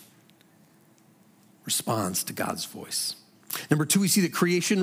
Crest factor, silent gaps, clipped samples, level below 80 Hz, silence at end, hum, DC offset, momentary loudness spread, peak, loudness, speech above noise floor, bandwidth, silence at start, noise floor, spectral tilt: 20 dB; none; under 0.1%; -78 dBFS; 0 s; none; under 0.1%; 13 LU; -8 dBFS; -26 LUFS; 33 dB; 16.5 kHz; 0 s; -59 dBFS; -3.5 dB/octave